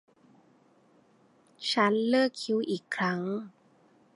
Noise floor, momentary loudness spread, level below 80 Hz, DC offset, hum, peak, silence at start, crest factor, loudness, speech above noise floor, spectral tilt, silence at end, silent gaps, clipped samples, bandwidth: -63 dBFS; 11 LU; -82 dBFS; under 0.1%; none; -10 dBFS; 1.6 s; 22 dB; -29 LUFS; 35 dB; -5 dB/octave; 0.65 s; none; under 0.1%; 11.5 kHz